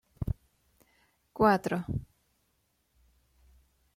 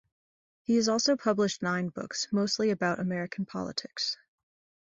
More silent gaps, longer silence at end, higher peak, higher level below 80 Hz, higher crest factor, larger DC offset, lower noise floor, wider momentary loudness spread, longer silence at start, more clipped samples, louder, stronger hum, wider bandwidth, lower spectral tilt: neither; first, 1.95 s vs 0.7 s; about the same, -12 dBFS vs -12 dBFS; first, -50 dBFS vs -70 dBFS; about the same, 22 dB vs 18 dB; neither; second, -75 dBFS vs under -90 dBFS; first, 15 LU vs 9 LU; second, 0.2 s vs 0.7 s; neither; about the same, -30 LUFS vs -29 LUFS; neither; first, 16 kHz vs 8 kHz; first, -7.5 dB/octave vs -4 dB/octave